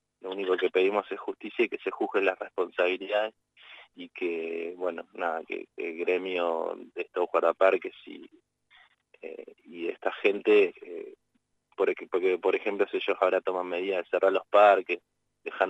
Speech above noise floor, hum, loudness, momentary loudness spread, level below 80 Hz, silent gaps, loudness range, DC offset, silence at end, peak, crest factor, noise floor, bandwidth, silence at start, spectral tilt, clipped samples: 47 dB; 50 Hz at -85 dBFS; -28 LUFS; 19 LU; -84 dBFS; none; 6 LU; under 0.1%; 0 s; -8 dBFS; 20 dB; -75 dBFS; 8 kHz; 0.25 s; -5.5 dB/octave; under 0.1%